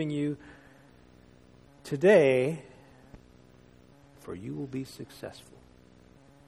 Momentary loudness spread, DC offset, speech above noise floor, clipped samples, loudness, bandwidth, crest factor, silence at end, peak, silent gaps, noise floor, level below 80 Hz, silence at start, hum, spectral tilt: 24 LU; under 0.1%; 29 dB; under 0.1%; -27 LUFS; 13.5 kHz; 22 dB; 1.1 s; -10 dBFS; none; -57 dBFS; -64 dBFS; 0 s; none; -6.5 dB/octave